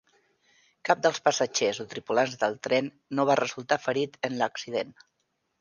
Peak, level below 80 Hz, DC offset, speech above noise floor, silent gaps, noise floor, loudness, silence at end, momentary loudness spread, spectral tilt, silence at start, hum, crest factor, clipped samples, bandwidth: -6 dBFS; -74 dBFS; under 0.1%; 50 dB; none; -77 dBFS; -27 LUFS; 0.7 s; 8 LU; -3.5 dB/octave; 0.85 s; none; 22 dB; under 0.1%; 10 kHz